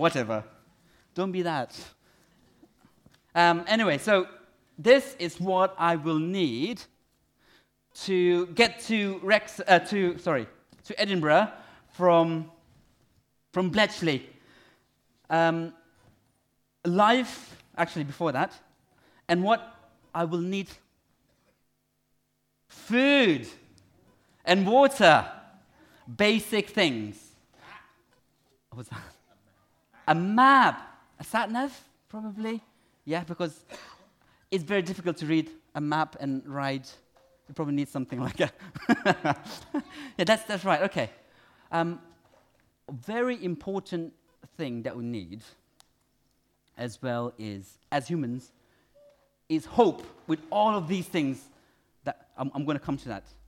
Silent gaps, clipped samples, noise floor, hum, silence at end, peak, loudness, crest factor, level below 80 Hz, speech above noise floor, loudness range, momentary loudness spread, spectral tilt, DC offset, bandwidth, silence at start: none; under 0.1%; -74 dBFS; none; 0.25 s; -4 dBFS; -26 LUFS; 24 dB; -66 dBFS; 48 dB; 11 LU; 19 LU; -5.5 dB/octave; under 0.1%; 16.5 kHz; 0 s